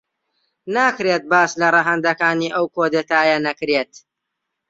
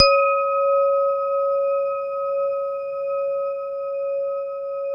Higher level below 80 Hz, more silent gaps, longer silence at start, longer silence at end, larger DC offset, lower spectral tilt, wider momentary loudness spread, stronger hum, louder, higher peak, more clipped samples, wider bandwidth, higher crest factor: second, -66 dBFS vs -60 dBFS; neither; first, 0.65 s vs 0 s; first, 0.85 s vs 0 s; neither; first, -4 dB/octave vs -2.5 dB/octave; second, 6 LU vs 9 LU; neither; first, -17 LUFS vs -22 LUFS; about the same, -2 dBFS vs -2 dBFS; neither; first, 7.8 kHz vs 5.4 kHz; about the same, 18 dB vs 20 dB